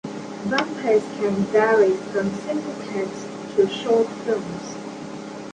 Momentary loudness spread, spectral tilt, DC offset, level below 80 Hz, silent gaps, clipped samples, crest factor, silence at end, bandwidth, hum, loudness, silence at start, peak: 15 LU; -5.5 dB/octave; under 0.1%; -62 dBFS; none; under 0.1%; 18 dB; 0 s; 9.6 kHz; none; -22 LUFS; 0.05 s; -4 dBFS